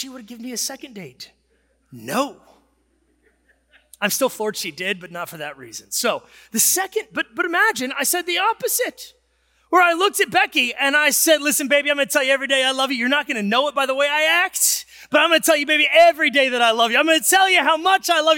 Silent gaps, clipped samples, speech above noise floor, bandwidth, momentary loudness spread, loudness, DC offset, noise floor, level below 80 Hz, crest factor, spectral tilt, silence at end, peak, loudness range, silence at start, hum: none; under 0.1%; 45 dB; 17 kHz; 13 LU; -18 LUFS; under 0.1%; -64 dBFS; -68 dBFS; 16 dB; -1 dB/octave; 0 s; -4 dBFS; 11 LU; 0 s; none